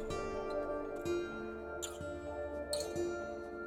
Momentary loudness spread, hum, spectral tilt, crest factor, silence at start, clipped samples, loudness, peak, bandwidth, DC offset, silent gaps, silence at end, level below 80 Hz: 5 LU; none; -4.5 dB/octave; 16 dB; 0 s; under 0.1%; -40 LUFS; -24 dBFS; 18 kHz; under 0.1%; none; 0 s; -56 dBFS